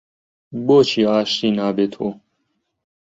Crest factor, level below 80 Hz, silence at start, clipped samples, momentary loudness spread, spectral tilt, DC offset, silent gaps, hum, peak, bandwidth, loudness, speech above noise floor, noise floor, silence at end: 18 dB; -62 dBFS; 0.5 s; under 0.1%; 13 LU; -5.5 dB/octave; under 0.1%; none; none; -2 dBFS; 7.8 kHz; -18 LUFS; 54 dB; -71 dBFS; 1 s